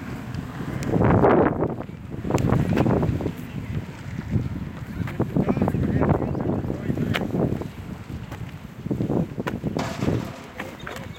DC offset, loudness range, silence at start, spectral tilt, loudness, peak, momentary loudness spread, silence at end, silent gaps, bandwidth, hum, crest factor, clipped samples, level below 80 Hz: under 0.1%; 6 LU; 0 s; -8 dB/octave; -25 LUFS; -2 dBFS; 15 LU; 0 s; none; 17 kHz; none; 22 dB; under 0.1%; -40 dBFS